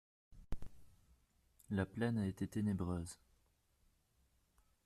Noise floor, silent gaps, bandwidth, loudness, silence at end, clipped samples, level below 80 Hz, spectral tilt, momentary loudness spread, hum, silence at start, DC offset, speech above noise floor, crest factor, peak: -77 dBFS; none; 13.5 kHz; -41 LUFS; 1.7 s; under 0.1%; -60 dBFS; -7 dB/octave; 15 LU; none; 0.3 s; under 0.1%; 37 dB; 18 dB; -26 dBFS